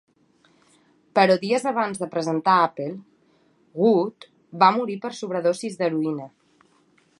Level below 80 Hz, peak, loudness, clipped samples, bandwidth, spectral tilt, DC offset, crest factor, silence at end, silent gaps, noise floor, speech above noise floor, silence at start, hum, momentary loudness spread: -76 dBFS; -2 dBFS; -22 LUFS; under 0.1%; 11.5 kHz; -5.5 dB/octave; under 0.1%; 22 dB; 0.95 s; none; -61 dBFS; 40 dB; 1.15 s; none; 15 LU